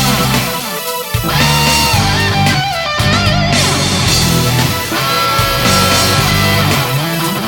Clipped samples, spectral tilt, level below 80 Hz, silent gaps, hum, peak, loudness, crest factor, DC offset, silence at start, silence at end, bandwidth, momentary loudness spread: under 0.1%; -3.5 dB/octave; -28 dBFS; none; none; 0 dBFS; -11 LUFS; 12 dB; under 0.1%; 0 s; 0 s; 18 kHz; 5 LU